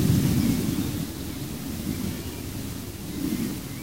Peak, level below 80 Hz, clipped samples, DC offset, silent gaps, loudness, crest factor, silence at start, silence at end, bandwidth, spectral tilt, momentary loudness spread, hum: -10 dBFS; -42 dBFS; under 0.1%; 0.3%; none; -28 LUFS; 18 dB; 0 s; 0 s; 16 kHz; -5.5 dB/octave; 11 LU; none